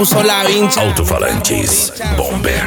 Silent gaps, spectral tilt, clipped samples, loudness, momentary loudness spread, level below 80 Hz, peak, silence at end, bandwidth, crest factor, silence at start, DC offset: none; -3.5 dB/octave; under 0.1%; -13 LUFS; 5 LU; -24 dBFS; 0 dBFS; 0 s; 19.5 kHz; 14 dB; 0 s; under 0.1%